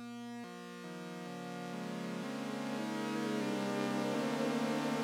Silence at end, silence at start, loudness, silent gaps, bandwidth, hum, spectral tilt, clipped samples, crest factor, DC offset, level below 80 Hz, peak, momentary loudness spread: 0 s; 0 s; -39 LUFS; none; 17 kHz; none; -5 dB/octave; under 0.1%; 18 dB; under 0.1%; under -90 dBFS; -20 dBFS; 11 LU